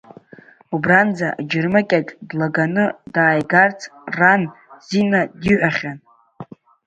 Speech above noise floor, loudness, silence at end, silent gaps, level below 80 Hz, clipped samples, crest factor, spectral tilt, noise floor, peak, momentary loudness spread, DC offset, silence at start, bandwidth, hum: 28 dB; -17 LUFS; 0.4 s; none; -54 dBFS; under 0.1%; 18 dB; -6.5 dB/octave; -46 dBFS; 0 dBFS; 13 LU; under 0.1%; 0.7 s; 8 kHz; none